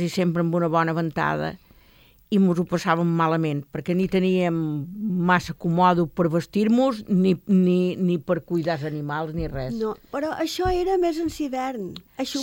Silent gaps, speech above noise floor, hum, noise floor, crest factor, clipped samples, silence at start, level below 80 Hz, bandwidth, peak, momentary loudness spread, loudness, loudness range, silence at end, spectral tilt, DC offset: none; 32 dB; none; -55 dBFS; 16 dB; under 0.1%; 0 s; -46 dBFS; 16.5 kHz; -6 dBFS; 9 LU; -23 LUFS; 5 LU; 0 s; -7 dB/octave; under 0.1%